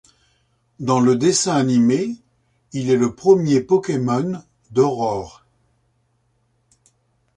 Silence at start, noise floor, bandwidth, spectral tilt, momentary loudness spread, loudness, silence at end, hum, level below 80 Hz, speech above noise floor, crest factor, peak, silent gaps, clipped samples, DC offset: 0.8 s; -65 dBFS; 11 kHz; -5.5 dB/octave; 13 LU; -18 LUFS; 2.05 s; none; -56 dBFS; 48 dB; 18 dB; -2 dBFS; none; under 0.1%; under 0.1%